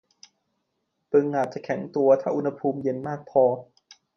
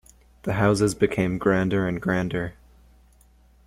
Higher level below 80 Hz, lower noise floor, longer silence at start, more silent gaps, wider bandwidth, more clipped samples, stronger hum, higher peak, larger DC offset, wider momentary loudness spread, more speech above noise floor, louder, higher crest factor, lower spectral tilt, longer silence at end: second, -72 dBFS vs -48 dBFS; first, -77 dBFS vs -56 dBFS; first, 1.1 s vs 0.45 s; neither; second, 6.6 kHz vs 15 kHz; neither; second, none vs 60 Hz at -45 dBFS; about the same, -8 dBFS vs -6 dBFS; neither; about the same, 9 LU vs 9 LU; first, 54 dB vs 33 dB; about the same, -24 LUFS vs -24 LUFS; about the same, 18 dB vs 20 dB; first, -8 dB/octave vs -6.5 dB/octave; second, 0.55 s vs 1.15 s